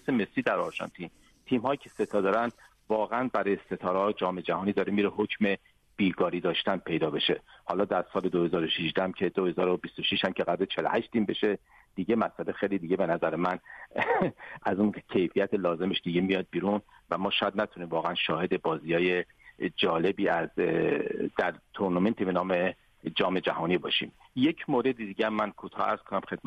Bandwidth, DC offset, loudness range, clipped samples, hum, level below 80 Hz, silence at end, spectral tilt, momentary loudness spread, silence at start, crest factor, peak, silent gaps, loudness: 10.5 kHz; under 0.1%; 1 LU; under 0.1%; none; -64 dBFS; 0.05 s; -7 dB/octave; 6 LU; 0.05 s; 16 dB; -12 dBFS; none; -29 LUFS